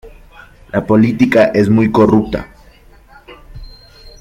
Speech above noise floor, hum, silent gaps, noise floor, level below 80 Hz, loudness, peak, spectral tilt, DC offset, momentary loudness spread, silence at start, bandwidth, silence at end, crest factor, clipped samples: 32 dB; none; none; -43 dBFS; -38 dBFS; -12 LUFS; 0 dBFS; -8 dB/octave; under 0.1%; 11 LU; 0.05 s; 12 kHz; 0.1 s; 14 dB; under 0.1%